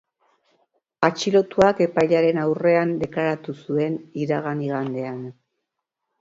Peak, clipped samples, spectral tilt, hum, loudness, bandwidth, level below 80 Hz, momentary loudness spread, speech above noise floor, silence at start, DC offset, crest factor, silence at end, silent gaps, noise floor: -2 dBFS; under 0.1%; -6.5 dB/octave; none; -22 LUFS; 7.8 kHz; -60 dBFS; 11 LU; 60 dB; 1 s; under 0.1%; 20 dB; 0.9 s; none; -81 dBFS